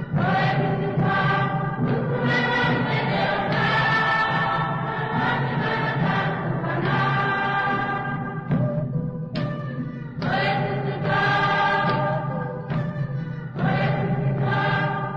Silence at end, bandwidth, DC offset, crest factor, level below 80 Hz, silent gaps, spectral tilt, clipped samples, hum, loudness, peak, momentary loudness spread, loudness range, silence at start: 0 s; 6.8 kHz; under 0.1%; 12 dB; -48 dBFS; none; -7.5 dB/octave; under 0.1%; none; -23 LUFS; -12 dBFS; 8 LU; 4 LU; 0 s